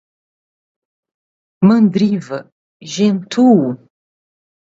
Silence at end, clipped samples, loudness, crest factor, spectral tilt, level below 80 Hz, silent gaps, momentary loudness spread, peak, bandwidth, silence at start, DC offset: 1 s; under 0.1%; -14 LUFS; 16 dB; -7 dB/octave; -60 dBFS; 2.52-2.80 s; 16 LU; 0 dBFS; 7.8 kHz; 1.6 s; under 0.1%